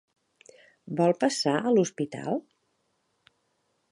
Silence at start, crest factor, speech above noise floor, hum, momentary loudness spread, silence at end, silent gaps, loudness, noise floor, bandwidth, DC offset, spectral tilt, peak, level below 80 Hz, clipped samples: 0.85 s; 20 dB; 49 dB; none; 10 LU; 1.5 s; none; -27 LUFS; -74 dBFS; 11.5 kHz; under 0.1%; -5 dB/octave; -10 dBFS; -78 dBFS; under 0.1%